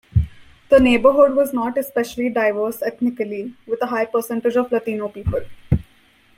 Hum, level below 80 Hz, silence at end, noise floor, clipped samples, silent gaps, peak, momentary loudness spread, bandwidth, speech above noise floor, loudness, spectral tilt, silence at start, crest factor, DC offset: none; -38 dBFS; 0.55 s; -54 dBFS; under 0.1%; none; -2 dBFS; 12 LU; 16.5 kHz; 36 dB; -19 LUFS; -7 dB/octave; 0.15 s; 18 dB; under 0.1%